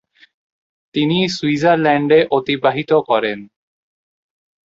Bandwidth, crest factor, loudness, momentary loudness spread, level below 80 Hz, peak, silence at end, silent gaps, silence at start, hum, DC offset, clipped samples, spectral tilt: 7.8 kHz; 16 dB; -16 LUFS; 8 LU; -58 dBFS; -2 dBFS; 1.2 s; none; 0.95 s; none; under 0.1%; under 0.1%; -6 dB/octave